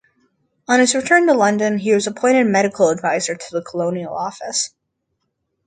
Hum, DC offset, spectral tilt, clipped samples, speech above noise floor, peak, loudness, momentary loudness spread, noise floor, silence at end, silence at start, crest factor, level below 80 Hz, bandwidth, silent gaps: none; under 0.1%; -3.5 dB/octave; under 0.1%; 56 dB; 0 dBFS; -17 LUFS; 12 LU; -73 dBFS; 1 s; 0.7 s; 18 dB; -64 dBFS; 9.6 kHz; none